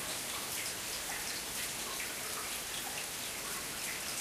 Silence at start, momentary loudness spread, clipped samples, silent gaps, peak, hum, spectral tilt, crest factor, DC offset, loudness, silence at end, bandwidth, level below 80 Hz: 0 s; 1 LU; under 0.1%; none; -24 dBFS; none; -0.5 dB/octave; 16 dB; under 0.1%; -37 LUFS; 0 s; 15.5 kHz; -64 dBFS